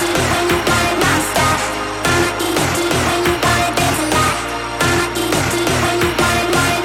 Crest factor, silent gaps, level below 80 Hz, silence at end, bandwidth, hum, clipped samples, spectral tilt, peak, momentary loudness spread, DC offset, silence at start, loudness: 14 dB; none; -34 dBFS; 0 s; 17.5 kHz; none; under 0.1%; -3.5 dB/octave; -2 dBFS; 3 LU; under 0.1%; 0 s; -15 LUFS